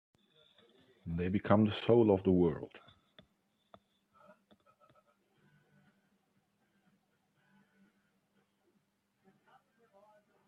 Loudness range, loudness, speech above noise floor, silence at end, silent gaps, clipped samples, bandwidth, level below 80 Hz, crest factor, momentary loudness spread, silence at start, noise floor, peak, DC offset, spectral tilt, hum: 7 LU; -31 LUFS; 48 dB; 7.7 s; none; under 0.1%; 4.6 kHz; -70 dBFS; 26 dB; 18 LU; 1.05 s; -78 dBFS; -12 dBFS; under 0.1%; -10 dB/octave; none